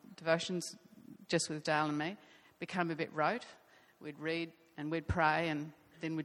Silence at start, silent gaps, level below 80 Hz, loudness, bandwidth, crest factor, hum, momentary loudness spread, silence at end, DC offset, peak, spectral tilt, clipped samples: 0.05 s; none; -58 dBFS; -36 LUFS; 13.5 kHz; 22 dB; none; 18 LU; 0 s; under 0.1%; -16 dBFS; -4.5 dB/octave; under 0.1%